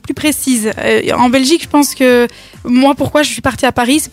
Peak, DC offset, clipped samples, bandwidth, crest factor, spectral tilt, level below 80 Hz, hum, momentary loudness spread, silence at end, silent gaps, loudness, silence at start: -2 dBFS; under 0.1%; under 0.1%; 16.5 kHz; 10 dB; -3.5 dB/octave; -42 dBFS; none; 4 LU; 0.05 s; none; -12 LUFS; 0.05 s